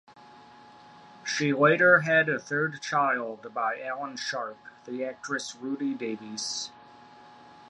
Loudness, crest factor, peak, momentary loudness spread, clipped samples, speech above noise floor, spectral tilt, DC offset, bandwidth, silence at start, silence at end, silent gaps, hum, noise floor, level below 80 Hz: -27 LUFS; 22 dB; -6 dBFS; 15 LU; under 0.1%; 24 dB; -4 dB/octave; under 0.1%; 11.5 kHz; 0.15 s; 0.05 s; none; none; -51 dBFS; -78 dBFS